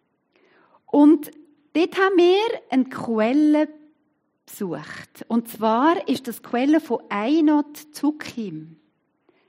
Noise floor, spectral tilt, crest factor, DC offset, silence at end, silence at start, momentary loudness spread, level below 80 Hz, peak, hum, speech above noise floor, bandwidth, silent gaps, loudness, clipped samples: -69 dBFS; -5.5 dB/octave; 16 dB; under 0.1%; 0.85 s; 0.95 s; 16 LU; -76 dBFS; -4 dBFS; none; 49 dB; 16 kHz; none; -21 LUFS; under 0.1%